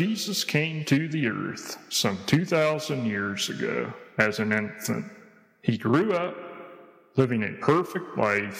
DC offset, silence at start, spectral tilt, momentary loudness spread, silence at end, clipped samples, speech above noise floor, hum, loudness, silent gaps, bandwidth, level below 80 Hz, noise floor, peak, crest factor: under 0.1%; 0 s; -5 dB/octave; 10 LU; 0 s; under 0.1%; 24 dB; none; -26 LUFS; none; 16.5 kHz; -70 dBFS; -50 dBFS; -6 dBFS; 20 dB